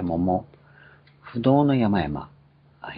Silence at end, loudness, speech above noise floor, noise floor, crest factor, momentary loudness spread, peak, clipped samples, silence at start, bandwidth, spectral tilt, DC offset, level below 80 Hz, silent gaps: 0 s; -23 LUFS; 31 dB; -52 dBFS; 18 dB; 18 LU; -6 dBFS; under 0.1%; 0 s; 5 kHz; -12 dB/octave; under 0.1%; -50 dBFS; none